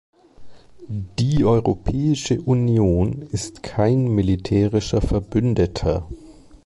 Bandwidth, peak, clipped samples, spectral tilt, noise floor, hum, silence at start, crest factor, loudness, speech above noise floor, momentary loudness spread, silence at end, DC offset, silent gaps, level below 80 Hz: 11.5 kHz; -6 dBFS; under 0.1%; -7 dB/octave; -39 dBFS; none; 0.4 s; 14 dB; -20 LUFS; 20 dB; 11 LU; 0.35 s; under 0.1%; none; -34 dBFS